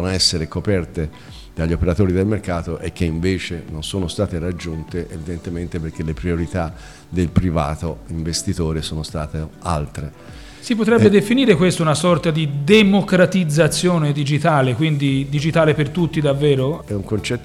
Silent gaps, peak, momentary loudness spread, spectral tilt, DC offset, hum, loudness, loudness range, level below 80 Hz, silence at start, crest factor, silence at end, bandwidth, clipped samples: none; -2 dBFS; 13 LU; -5.5 dB/octave; 0.3%; none; -19 LUFS; 9 LU; -36 dBFS; 0 s; 16 dB; 0 s; 14 kHz; under 0.1%